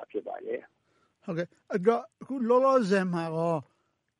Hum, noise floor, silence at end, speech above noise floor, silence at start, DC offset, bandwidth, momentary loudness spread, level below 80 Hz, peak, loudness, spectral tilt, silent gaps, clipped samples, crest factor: none; -67 dBFS; 0.55 s; 40 dB; 0 s; under 0.1%; 11 kHz; 15 LU; -80 dBFS; -10 dBFS; -29 LUFS; -7 dB/octave; none; under 0.1%; 18 dB